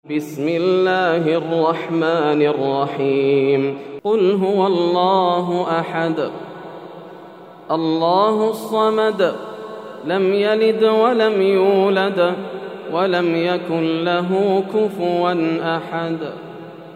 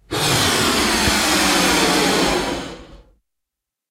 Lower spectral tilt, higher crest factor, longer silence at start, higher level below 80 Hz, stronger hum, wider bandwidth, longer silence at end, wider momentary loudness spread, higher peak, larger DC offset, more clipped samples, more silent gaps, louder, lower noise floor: first, -7 dB/octave vs -2.5 dB/octave; about the same, 16 dB vs 16 dB; about the same, 0.05 s vs 0.1 s; second, -72 dBFS vs -38 dBFS; neither; about the same, 15 kHz vs 16 kHz; second, 0 s vs 0.95 s; first, 14 LU vs 8 LU; about the same, -2 dBFS vs -4 dBFS; neither; neither; neither; about the same, -18 LUFS vs -16 LUFS; second, -39 dBFS vs -82 dBFS